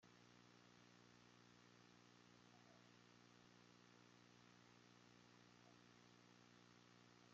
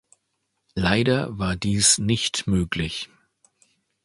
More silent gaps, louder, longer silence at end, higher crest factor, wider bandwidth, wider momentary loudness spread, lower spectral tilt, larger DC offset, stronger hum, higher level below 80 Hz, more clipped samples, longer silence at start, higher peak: neither; second, -70 LUFS vs -22 LUFS; second, 0 s vs 1 s; second, 14 dB vs 22 dB; second, 7.4 kHz vs 11.5 kHz; second, 0 LU vs 14 LU; about the same, -3.5 dB/octave vs -3.5 dB/octave; neither; first, 60 Hz at -75 dBFS vs none; second, under -90 dBFS vs -42 dBFS; neither; second, 0 s vs 0.75 s; second, -56 dBFS vs -2 dBFS